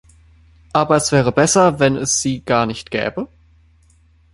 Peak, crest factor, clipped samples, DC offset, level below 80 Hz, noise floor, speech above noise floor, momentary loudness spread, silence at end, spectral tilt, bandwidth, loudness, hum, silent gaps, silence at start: 0 dBFS; 18 dB; under 0.1%; under 0.1%; -46 dBFS; -53 dBFS; 37 dB; 10 LU; 1.1 s; -4 dB/octave; 11.5 kHz; -16 LUFS; none; none; 0.75 s